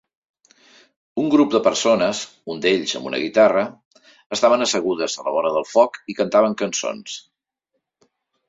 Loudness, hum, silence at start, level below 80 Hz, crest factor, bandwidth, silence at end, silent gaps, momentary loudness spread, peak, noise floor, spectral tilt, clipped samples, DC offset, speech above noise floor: -19 LUFS; none; 1.15 s; -64 dBFS; 18 dB; 7.8 kHz; 1.3 s; 3.85-3.91 s, 4.26-4.30 s; 13 LU; -2 dBFS; -77 dBFS; -3.5 dB/octave; under 0.1%; under 0.1%; 58 dB